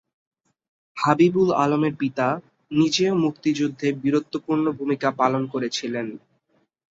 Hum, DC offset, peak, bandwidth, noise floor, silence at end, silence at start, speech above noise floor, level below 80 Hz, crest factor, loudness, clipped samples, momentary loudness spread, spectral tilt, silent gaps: none; under 0.1%; -2 dBFS; 7.8 kHz; -67 dBFS; 0.75 s; 0.95 s; 46 dB; -64 dBFS; 20 dB; -22 LUFS; under 0.1%; 8 LU; -5.5 dB/octave; none